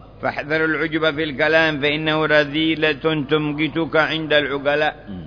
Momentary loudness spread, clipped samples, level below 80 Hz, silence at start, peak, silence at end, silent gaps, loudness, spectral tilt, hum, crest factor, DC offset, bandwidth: 5 LU; under 0.1%; -48 dBFS; 0 s; -2 dBFS; 0 s; none; -19 LUFS; -6.5 dB/octave; none; 16 dB; under 0.1%; 5.4 kHz